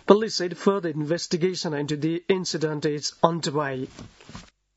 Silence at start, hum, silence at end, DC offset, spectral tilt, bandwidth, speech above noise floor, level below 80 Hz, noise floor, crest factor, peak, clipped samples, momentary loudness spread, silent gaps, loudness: 0.05 s; none; 0.35 s; under 0.1%; -5 dB/octave; 8 kHz; 22 dB; -62 dBFS; -46 dBFS; 24 dB; 0 dBFS; under 0.1%; 19 LU; none; -25 LUFS